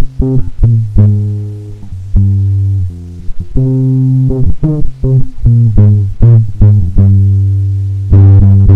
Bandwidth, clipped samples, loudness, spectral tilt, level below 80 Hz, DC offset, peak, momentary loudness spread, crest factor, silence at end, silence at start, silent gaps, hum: 1.6 kHz; 1%; -10 LUFS; -12 dB/octave; -16 dBFS; under 0.1%; 0 dBFS; 13 LU; 8 dB; 0 s; 0 s; none; none